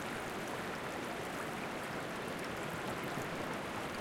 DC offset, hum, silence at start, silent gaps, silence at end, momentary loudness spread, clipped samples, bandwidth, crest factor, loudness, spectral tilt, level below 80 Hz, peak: under 0.1%; none; 0 s; none; 0 s; 1 LU; under 0.1%; 17 kHz; 14 dB; -40 LUFS; -4 dB/octave; -64 dBFS; -26 dBFS